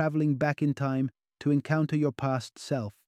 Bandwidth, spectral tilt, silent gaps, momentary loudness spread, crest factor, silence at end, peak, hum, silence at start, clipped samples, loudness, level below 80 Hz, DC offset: 10.5 kHz; -7.5 dB/octave; none; 7 LU; 18 dB; 0.15 s; -10 dBFS; none; 0 s; under 0.1%; -29 LUFS; -66 dBFS; under 0.1%